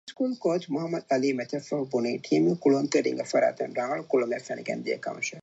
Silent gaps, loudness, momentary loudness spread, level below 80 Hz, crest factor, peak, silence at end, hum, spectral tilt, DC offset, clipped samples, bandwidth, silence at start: none; -27 LUFS; 8 LU; -80 dBFS; 16 dB; -10 dBFS; 0 s; none; -5.5 dB/octave; under 0.1%; under 0.1%; 8.2 kHz; 0.05 s